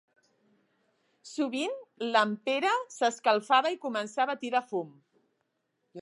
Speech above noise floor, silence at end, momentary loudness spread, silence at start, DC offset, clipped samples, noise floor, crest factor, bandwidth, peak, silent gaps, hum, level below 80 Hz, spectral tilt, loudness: 50 dB; 0 s; 11 LU; 1.25 s; under 0.1%; under 0.1%; -79 dBFS; 22 dB; 11.5 kHz; -10 dBFS; none; none; -90 dBFS; -3 dB/octave; -29 LUFS